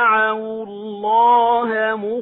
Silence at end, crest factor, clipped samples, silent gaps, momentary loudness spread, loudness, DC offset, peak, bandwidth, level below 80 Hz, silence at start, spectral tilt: 0 s; 12 dB; under 0.1%; none; 15 LU; -17 LUFS; under 0.1%; -4 dBFS; 4.1 kHz; -64 dBFS; 0 s; -7.5 dB/octave